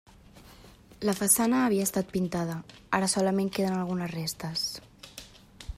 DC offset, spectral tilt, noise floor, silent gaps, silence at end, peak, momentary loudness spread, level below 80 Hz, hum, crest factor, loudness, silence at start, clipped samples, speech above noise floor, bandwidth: under 0.1%; -4 dB/octave; -53 dBFS; none; 0.05 s; -10 dBFS; 21 LU; -54 dBFS; none; 20 dB; -28 LUFS; 0.35 s; under 0.1%; 25 dB; 15.5 kHz